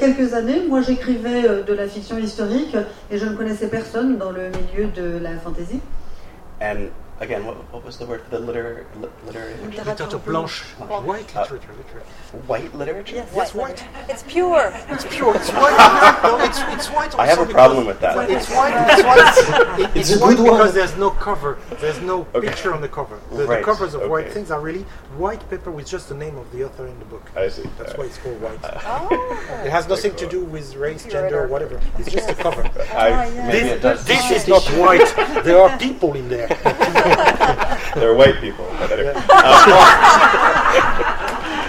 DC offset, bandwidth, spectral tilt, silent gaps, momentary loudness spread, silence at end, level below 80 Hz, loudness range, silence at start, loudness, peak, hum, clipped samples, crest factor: under 0.1%; 16.5 kHz; -4 dB/octave; none; 19 LU; 0 s; -32 dBFS; 16 LU; 0 s; -15 LUFS; 0 dBFS; none; under 0.1%; 16 dB